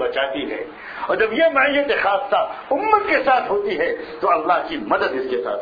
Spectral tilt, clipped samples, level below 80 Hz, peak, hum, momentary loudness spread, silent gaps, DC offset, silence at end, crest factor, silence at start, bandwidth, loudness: -6 dB/octave; under 0.1%; -54 dBFS; -2 dBFS; none; 8 LU; none; under 0.1%; 0 s; 18 dB; 0 s; 5 kHz; -19 LUFS